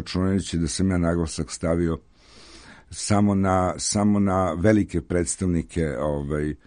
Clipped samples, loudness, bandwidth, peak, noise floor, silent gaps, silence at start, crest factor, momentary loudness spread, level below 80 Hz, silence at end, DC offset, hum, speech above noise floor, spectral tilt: under 0.1%; -23 LUFS; 10.5 kHz; -4 dBFS; -48 dBFS; none; 0 s; 20 dB; 7 LU; -40 dBFS; 0.1 s; under 0.1%; none; 26 dB; -5.5 dB/octave